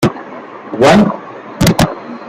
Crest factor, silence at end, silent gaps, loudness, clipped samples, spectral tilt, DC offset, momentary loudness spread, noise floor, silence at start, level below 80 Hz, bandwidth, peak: 14 dB; 0 s; none; -12 LUFS; under 0.1%; -5.5 dB/octave; under 0.1%; 21 LU; -30 dBFS; 0 s; -36 dBFS; 16.5 kHz; 0 dBFS